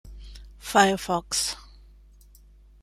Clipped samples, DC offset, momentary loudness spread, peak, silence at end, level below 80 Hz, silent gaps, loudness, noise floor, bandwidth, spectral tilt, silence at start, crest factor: under 0.1%; under 0.1%; 25 LU; -4 dBFS; 1.2 s; -48 dBFS; none; -24 LUFS; -52 dBFS; 16 kHz; -2.5 dB/octave; 0.05 s; 24 dB